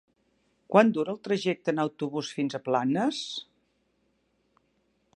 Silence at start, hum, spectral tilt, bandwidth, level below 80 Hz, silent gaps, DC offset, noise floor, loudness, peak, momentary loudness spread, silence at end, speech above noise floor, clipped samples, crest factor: 0.7 s; none; -5.5 dB/octave; 10.5 kHz; -78 dBFS; none; under 0.1%; -72 dBFS; -27 LUFS; -6 dBFS; 11 LU; 1.75 s; 45 dB; under 0.1%; 24 dB